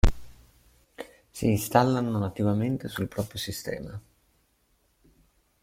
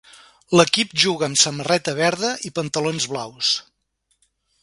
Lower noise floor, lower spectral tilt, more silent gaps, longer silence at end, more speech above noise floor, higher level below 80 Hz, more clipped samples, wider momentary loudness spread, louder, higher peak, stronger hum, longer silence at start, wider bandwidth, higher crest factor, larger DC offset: about the same, -69 dBFS vs -70 dBFS; first, -6 dB/octave vs -3 dB/octave; neither; first, 1.65 s vs 1 s; second, 42 dB vs 50 dB; first, -36 dBFS vs -62 dBFS; neither; first, 21 LU vs 8 LU; second, -28 LUFS vs -19 LUFS; second, -6 dBFS vs 0 dBFS; neither; second, 0.05 s vs 0.5 s; first, 16.5 kHz vs 11.5 kHz; about the same, 24 dB vs 22 dB; neither